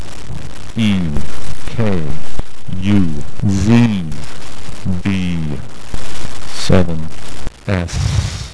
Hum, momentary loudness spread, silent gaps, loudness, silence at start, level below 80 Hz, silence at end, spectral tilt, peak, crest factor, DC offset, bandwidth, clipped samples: none; 16 LU; none; -18 LUFS; 0 s; -30 dBFS; 0 s; -6.5 dB/octave; 0 dBFS; 14 dB; 30%; 11 kHz; under 0.1%